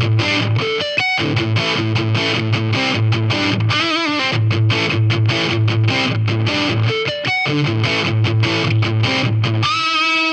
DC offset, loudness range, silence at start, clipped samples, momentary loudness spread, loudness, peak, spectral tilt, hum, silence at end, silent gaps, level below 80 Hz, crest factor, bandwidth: under 0.1%; 1 LU; 0 s; under 0.1%; 2 LU; -16 LUFS; -4 dBFS; -5.5 dB/octave; none; 0 s; none; -50 dBFS; 12 dB; 8.6 kHz